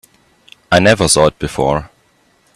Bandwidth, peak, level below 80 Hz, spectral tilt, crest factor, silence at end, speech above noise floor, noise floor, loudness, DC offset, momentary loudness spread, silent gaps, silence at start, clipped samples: 14.5 kHz; 0 dBFS; -38 dBFS; -4 dB/octave; 16 dB; 0.7 s; 43 dB; -55 dBFS; -13 LUFS; under 0.1%; 8 LU; none; 0.7 s; under 0.1%